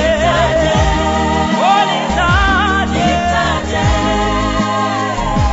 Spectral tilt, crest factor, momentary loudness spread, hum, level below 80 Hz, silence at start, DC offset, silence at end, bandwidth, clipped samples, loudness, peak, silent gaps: -5 dB/octave; 10 dB; 4 LU; none; -22 dBFS; 0 s; under 0.1%; 0 s; 8 kHz; under 0.1%; -14 LUFS; -2 dBFS; none